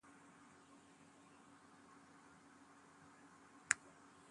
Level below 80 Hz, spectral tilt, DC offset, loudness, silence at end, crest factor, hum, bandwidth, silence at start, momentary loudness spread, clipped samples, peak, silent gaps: -86 dBFS; -0.5 dB/octave; under 0.1%; -41 LUFS; 0 s; 42 dB; none; 11 kHz; 0.05 s; 24 LU; under 0.1%; -12 dBFS; none